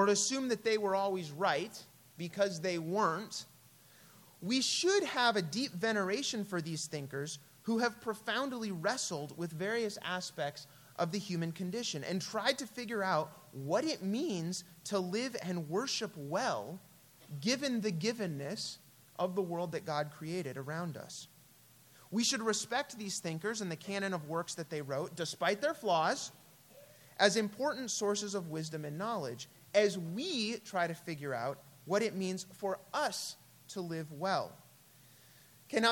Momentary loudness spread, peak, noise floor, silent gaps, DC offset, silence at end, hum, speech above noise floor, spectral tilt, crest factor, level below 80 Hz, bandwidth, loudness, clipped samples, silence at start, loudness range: 12 LU; -12 dBFS; -62 dBFS; none; under 0.1%; 0 s; none; 27 dB; -3.5 dB/octave; 24 dB; -82 dBFS; 17.5 kHz; -36 LUFS; under 0.1%; 0 s; 4 LU